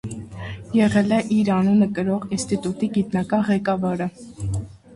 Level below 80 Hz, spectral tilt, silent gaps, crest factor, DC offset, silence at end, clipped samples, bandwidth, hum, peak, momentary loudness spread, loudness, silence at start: -46 dBFS; -6.5 dB/octave; none; 14 dB; under 0.1%; 0 s; under 0.1%; 11.5 kHz; none; -6 dBFS; 13 LU; -21 LUFS; 0.05 s